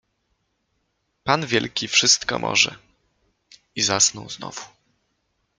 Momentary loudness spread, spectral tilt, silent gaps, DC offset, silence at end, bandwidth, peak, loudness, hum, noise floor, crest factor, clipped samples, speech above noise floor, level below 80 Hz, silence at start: 17 LU; -1 dB/octave; none; under 0.1%; 0.9 s; 13.5 kHz; -2 dBFS; -19 LUFS; none; -72 dBFS; 24 dB; under 0.1%; 51 dB; -60 dBFS; 1.25 s